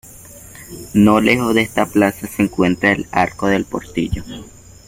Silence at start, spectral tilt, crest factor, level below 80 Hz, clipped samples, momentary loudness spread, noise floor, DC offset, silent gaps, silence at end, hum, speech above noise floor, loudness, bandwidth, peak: 0.15 s; -5.5 dB/octave; 16 dB; -40 dBFS; under 0.1%; 21 LU; -39 dBFS; under 0.1%; none; 0.4 s; none; 23 dB; -16 LUFS; 16.5 kHz; 0 dBFS